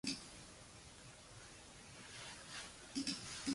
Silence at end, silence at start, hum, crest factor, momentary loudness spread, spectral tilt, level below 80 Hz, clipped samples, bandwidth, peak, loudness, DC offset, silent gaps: 0 s; 0.05 s; none; 22 dB; 14 LU; -2.5 dB/octave; -68 dBFS; under 0.1%; 11.5 kHz; -26 dBFS; -49 LUFS; under 0.1%; none